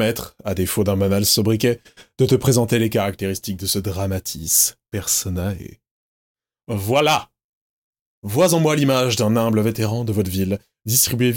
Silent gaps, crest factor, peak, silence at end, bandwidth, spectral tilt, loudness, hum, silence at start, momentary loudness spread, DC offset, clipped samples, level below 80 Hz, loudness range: 5.91-6.35 s, 7.44-7.93 s, 8.01-8.22 s; 18 dB; -2 dBFS; 0 s; 17 kHz; -4.5 dB/octave; -19 LUFS; none; 0 s; 10 LU; under 0.1%; under 0.1%; -50 dBFS; 4 LU